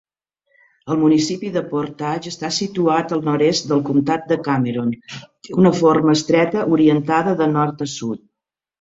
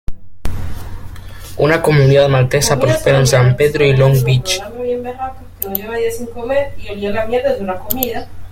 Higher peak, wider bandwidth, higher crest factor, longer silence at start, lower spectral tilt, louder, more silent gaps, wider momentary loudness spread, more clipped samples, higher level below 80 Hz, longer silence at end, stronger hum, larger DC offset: about the same, -2 dBFS vs 0 dBFS; second, 8 kHz vs 16.5 kHz; about the same, 16 dB vs 14 dB; first, 0.85 s vs 0.1 s; about the same, -6 dB/octave vs -5.5 dB/octave; second, -18 LUFS vs -14 LUFS; neither; second, 10 LU vs 18 LU; neither; second, -58 dBFS vs -32 dBFS; first, 0.65 s vs 0 s; neither; neither